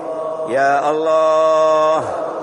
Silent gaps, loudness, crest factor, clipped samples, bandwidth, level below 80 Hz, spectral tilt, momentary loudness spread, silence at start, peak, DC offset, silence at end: none; -15 LUFS; 12 dB; under 0.1%; 10.5 kHz; -64 dBFS; -4.5 dB/octave; 10 LU; 0 s; -4 dBFS; under 0.1%; 0 s